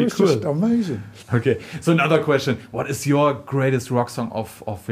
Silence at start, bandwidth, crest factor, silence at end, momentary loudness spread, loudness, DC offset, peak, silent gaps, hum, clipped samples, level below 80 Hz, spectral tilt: 0 s; 15.5 kHz; 18 dB; 0 s; 10 LU; -21 LUFS; under 0.1%; -4 dBFS; none; none; under 0.1%; -56 dBFS; -6.5 dB/octave